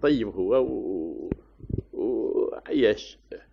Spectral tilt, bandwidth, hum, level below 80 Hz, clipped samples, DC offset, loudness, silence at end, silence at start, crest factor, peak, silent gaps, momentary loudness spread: -5.5 dB/octave; 7 kHz; none; -48 dBFS; under 0.1%; under 0.1%; -27 LUFS; 0.15 s; 0 s; 18 dB; -8 dBFS; none; 12 LU